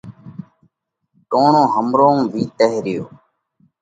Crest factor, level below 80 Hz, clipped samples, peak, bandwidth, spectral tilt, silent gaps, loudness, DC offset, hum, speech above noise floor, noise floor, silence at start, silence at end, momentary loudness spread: 18 dB; -62 dBFS; under 0.1%; 0 dBFS; 9.2 kHz; -7 dB/octave; none; -16 LUFS; under 0.1%; none; 54 dB; -69 dBFS; 0.05 s; 0.75 s; 23 LU